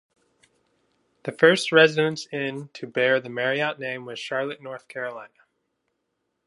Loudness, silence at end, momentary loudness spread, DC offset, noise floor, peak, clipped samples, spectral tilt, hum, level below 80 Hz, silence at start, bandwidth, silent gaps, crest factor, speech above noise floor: -23 LUFS; 1.2 s; 19 LU; under 0.1%; -77 dBFS; -2 dBFS; under 0.1%; -4.5 dB/octave; none; -78 dBFS; 1.25 s; 11.5 kHz; none; 22 dB; 54 dB